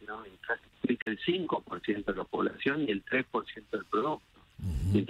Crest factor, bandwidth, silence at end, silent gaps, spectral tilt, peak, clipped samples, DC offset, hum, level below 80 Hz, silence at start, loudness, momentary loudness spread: 20 dB; 12.5 kHz; 0 s; 1.02-1.06 s; -7 dB/octave; -14 dBFS; under 0.1%; under 0.1%; none; -48 dBFS; 0 s; -33 LUFS; 9 LU